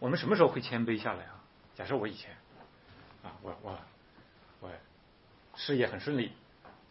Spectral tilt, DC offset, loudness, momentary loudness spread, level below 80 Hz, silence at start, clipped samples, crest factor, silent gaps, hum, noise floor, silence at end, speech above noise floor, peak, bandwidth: -4.5 dB/octave; under 0.1%; -33 LUFS; 24 LU; -68 dBFS; 0 s; under 0.1%; 26 dB; none; none; -62 dBFS; 0.2 s; 29 dB; -10 dBFS; 5.8 kHz